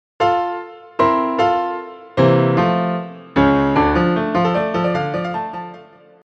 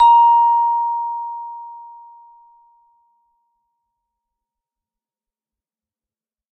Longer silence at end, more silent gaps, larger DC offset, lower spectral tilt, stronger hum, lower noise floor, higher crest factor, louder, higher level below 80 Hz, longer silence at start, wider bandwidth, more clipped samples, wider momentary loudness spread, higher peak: second, 0.4 s vs 4.65 s; neither; neither; first, -8 dB/octave vs 1 dB/octave; neither; second, -42 dBFS vs under -90 dBFS; about the same, 16 dB vs 16 dB; about the same, -17 LUFS vs -15 LUFS; first, -40 dBFS vs -64 dBFS; first, 0.2 s vs 0 s; first, 7.4 kHz vs 4 kHz; neither; second, 12 LU vs 24 LU; about the same, -2 dBFS vs -4 dBFS